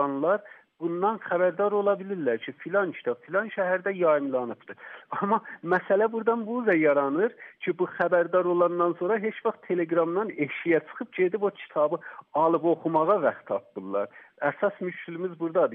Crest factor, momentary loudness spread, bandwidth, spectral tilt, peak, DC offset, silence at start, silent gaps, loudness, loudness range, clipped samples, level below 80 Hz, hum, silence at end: 16 dB; 10 LU; 4 kHz; -5 dB/octave; -10 dBFS; under 0.1%; 0 s; none; -27 LUFS; 3 LU; under 0.1%; -82 dBFS; none; 0 s